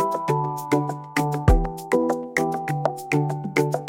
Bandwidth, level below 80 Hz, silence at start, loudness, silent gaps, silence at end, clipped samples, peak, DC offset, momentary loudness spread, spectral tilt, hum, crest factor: 17 kHz; -30 dBFS; 0 s; -24 LUFS; none; 0 s; under 0.1%; -4 dBFS; under 0.1%; 4 LU; -6.5 dB/octave; none; 18 dB